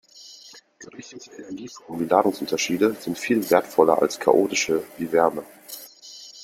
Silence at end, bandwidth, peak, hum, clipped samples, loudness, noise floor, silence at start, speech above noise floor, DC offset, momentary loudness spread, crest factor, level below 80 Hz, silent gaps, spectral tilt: 0 s; 16.5 kHz; -2 dBFS; none; under 0.1%; -21 LUFS; -48 dBFS; 0.2 s; 26 dB; under 0.1%; 21 LU; 22 dB; -66 dBFS; none; -4 dB/octave